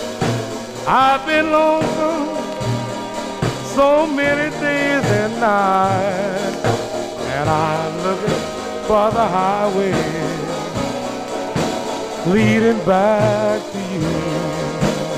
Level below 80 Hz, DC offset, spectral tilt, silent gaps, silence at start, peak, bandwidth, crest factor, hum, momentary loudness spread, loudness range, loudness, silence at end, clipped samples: -44 dBFS; 0.2%; -5.5 dB/octave; none; 0 s; -2 dBFS; 15.5 kHz; 16 dB; none; 9 LU; 3 LU; -18 LUFS; 0 s; under 0.1%